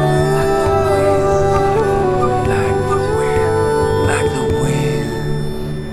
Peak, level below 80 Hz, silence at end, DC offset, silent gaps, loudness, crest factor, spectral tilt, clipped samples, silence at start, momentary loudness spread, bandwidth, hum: -2 dBFS; -28 dBFS; 0 s; under 0.1%; none; -16 LUFS; 14 dB; -6.5 dB/octave; under 0.1%; 0 s; 6 LU; 14 kHz; none